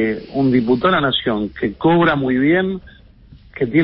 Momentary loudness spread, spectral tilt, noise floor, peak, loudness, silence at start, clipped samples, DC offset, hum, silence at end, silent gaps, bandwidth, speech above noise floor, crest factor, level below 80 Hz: 9 LU; -11.5 dB/octave; -44 dBFS; -2 dBFS; -17 LUFS; 0 s; under 0.1%; under 0.1%; none; 0 s; none; 5.6 kHz; 28 dB; 14 dB; -44 dBFS